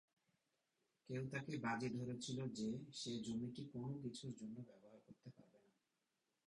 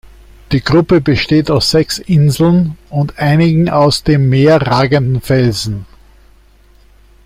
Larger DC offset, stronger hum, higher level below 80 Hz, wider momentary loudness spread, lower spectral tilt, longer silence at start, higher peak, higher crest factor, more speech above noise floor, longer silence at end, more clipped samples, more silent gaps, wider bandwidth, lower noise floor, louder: neither; neither; second, -80 dBFS vs -36 dBFS; first, 18 LU vs 8 LU; about the same, -5.5 dB/octave vs -6.5 dB/octave; first, 1.1 s vs 0.5 s; second, -32 dBFS vs 0 dBFS; first, 18 dB vs 12 dB; first, 42 dB vs 34 dB; second, 0.9 s vs 1.4 s; neither; neither; second, 11 kHz vs 16 kHz; first, -89 dBFS vs -45 dBFS; second, -48 LUFS vs -12 LUFS